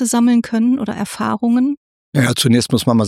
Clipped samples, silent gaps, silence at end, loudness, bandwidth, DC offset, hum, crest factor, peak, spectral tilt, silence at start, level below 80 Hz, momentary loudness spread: under 0.1%; 1.77-2.12 s; 0 s; -16 LUFS; 15 kHz; under 0.1%; none; 14 dB; -2 dBFS; -5 dB/octave; 0 s; -52 dBFS; 8 LU